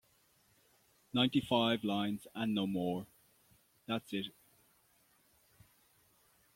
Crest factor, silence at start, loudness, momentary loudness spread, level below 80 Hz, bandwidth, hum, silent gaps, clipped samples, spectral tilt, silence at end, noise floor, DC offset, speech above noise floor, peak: 22 dB; 1.15 s; -35 LUFS; 12 LU; -74 dBFS; 16.5 kHz; none; none; under 0.1%; -6 dB/octave; 2.25 s; -71 dBFS; under 0.1%; 37 dB; -16 dBFS